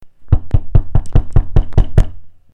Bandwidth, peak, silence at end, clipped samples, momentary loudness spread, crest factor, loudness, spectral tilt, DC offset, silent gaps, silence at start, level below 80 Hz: 3.9 kHz; 0 dBFS; 0.15 s; under 0.1%; 3 LU; 12 dB; -17 LUFS; -9 dB/octave; under 0.1%; none; 0.05 s; -14 dBFS